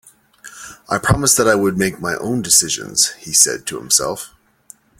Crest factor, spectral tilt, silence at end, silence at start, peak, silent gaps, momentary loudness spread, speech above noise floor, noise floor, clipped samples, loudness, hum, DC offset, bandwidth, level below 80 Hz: 18 dB; -2.5 dB/octave; 0.75 s; 0.45 s; 0 dBFS; none; 17 LU; 30 dB; -47 dBFS; under 0.1%; -15 LUFS; none; under 0.1%; 17 kHz; -42 dBFS